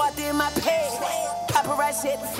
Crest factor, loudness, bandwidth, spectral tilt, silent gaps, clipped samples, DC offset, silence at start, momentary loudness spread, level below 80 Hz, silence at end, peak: 16 dB; -24 LUFS; 16 kHz; -3 dB/octave; none; under 0.1%; under 0.1%; 0 s; 4 LU; -50 dBFS; 0 s; -8 dBFS